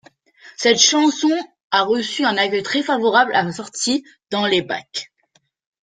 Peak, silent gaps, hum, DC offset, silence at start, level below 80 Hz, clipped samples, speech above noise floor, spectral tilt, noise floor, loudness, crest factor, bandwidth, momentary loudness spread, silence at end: 0 dBFS; 1.63-1.70 s; none; under 0.1%; 0.45 s; -66 dBFS; under 0.1%; 45 dB; -2 dB/octave; -63 dBFS; -18 LUFS; 20 dB; 10 kHz; 13 LU; 0.75 s